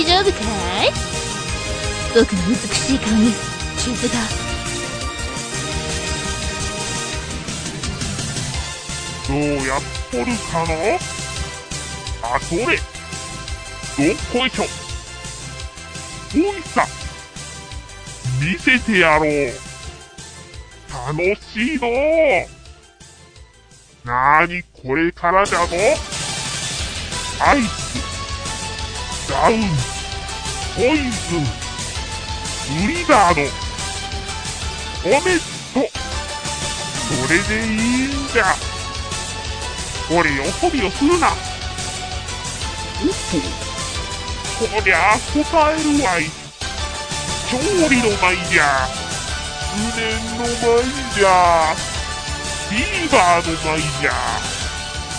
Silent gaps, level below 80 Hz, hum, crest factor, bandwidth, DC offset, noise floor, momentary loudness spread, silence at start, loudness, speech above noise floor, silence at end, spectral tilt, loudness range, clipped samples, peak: none; -34 dBFS; none; 20 dB; 10.5 kHz; under 0.1%; -47 dBFS; 12 LU; 0 s; -19 LUFS; 29 dB; 0 s; -3.5 dB/octave; 5 LU; under 0.1%; 0 dBFS